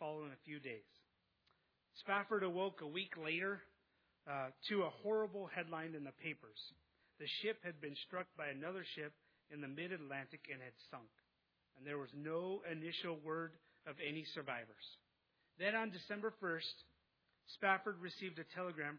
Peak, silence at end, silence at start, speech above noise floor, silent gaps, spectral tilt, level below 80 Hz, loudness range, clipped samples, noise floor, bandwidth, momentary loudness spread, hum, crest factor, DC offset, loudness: -22 dBFS; 0 s; 0 s; 39 dB; none; -2.5 dB/octave; under -90 dBFS; 6 LU; under 0.1%; -84 dBFS; 5.4 kHz; 15 LU; none; 24 dB; under 0.1%; -45 LUFS